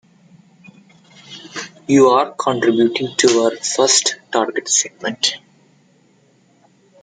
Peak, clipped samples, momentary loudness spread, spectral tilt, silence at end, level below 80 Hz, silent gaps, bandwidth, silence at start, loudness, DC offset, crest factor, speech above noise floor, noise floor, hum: 0 dBFS; under 0.1%; 17 LU; -2.5 dB/octave; 1.65 s; -64 dBFS; none; 10 kHz; 1.3 s; -15 LUFS; under 0.1%; 18 dB; 39 dB; -55 dBFS; none